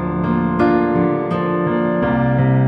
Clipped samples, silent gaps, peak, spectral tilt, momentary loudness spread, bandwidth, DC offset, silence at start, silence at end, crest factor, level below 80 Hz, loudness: under 0.1%; none; -2 dBFS; -10.5 dB/octave; 4 LU; 5 kHz; under 0.1%; 0 s; 0 s; 14 dB; -38 dBFS; -17 LUFS